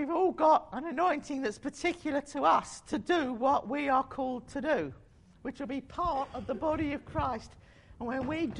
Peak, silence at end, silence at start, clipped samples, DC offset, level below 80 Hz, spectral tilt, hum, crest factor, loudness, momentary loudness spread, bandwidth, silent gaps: -14 dBFS; 0 s; 0 s; under 0.1%; under 0.1%; -54 dBFS; -5.5 dB/octave; none; 18 dB; -31 LUFS; 11 LU; 11 kHz; none